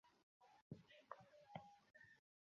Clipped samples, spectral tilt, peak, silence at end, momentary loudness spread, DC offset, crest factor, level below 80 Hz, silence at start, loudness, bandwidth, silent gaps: under 0.1%; -4.5 dB/octave; -36 dBFS; 0.3 s; 8 LU; under 0.1%; 28 dB; -90 dBFS; 0.05 s; -63 LUFS; 7 kHz; 0.23-0.40 s, 0.62-0.70 s